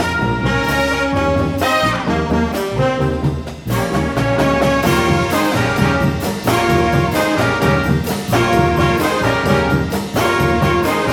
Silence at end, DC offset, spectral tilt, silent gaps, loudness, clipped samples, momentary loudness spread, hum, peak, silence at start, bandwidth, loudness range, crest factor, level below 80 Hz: 0 s; under 0.1%; -5.5 dB/octave; none; -16 LUFS; under 0.1%; 4 LU; none; 0 dBFS; 0 s; 18.5 kHz; 2 LU; 14 dB; -30 dBFS